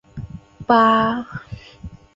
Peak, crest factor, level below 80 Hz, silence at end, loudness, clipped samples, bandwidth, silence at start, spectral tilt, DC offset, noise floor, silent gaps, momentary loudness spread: -2 dBFS; 18 dB; -46 dBFS; 0.2 s; -17 LUFS; under 0.1%; 7.6 kHz; 0.15 s; -7 dB/octave; under 0.1%; -39 dBFS; none; 24 LU